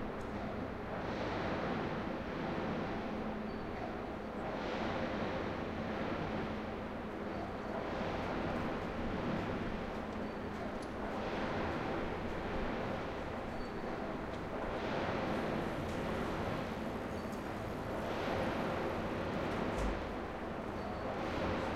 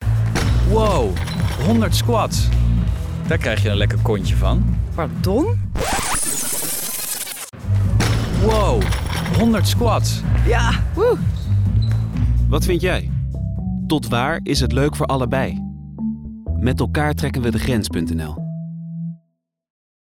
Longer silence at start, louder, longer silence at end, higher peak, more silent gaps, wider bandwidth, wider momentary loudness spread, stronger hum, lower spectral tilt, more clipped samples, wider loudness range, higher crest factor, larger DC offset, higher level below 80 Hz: about the same, 0 s vs 0 s; second, -39 LUFS vs -19 LUFS; second, 0 s vs 0.9 s; second, -24 dBFS vs -8 dBFS; neither; second, 16 kHz vs 18.5 kHz; second, 5 LU vs 8 LU; neither; about the same, -6.5 dB/octave vs -5.5 dB/octave; neither; second, 1 LU vs 4 LU; about the same, 14 dB vs 10 dB; neither; second, -50 dBFS vs -24 dBFS